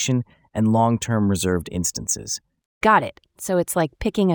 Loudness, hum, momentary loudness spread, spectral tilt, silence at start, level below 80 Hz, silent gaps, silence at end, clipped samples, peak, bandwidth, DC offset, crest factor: -22 LUFS; none; 12 LU; -5 dB/octave; 0 s; -48 dBFS; 2.66-2.81 s; 0 s; under 0.1%; -4 dBFS; over 20 kHz; under 0.1%; 18 dB